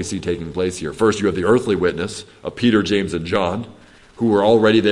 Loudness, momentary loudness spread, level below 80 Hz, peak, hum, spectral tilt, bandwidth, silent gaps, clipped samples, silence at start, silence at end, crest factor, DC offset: -18 LUFS; 13 LU; -50 dBFS; -2 dBFS; none; -5.5 dB/octave; 11.5 kHz; none; under 0.1%; 0 s; 0 s; 16 dB; under 0.1%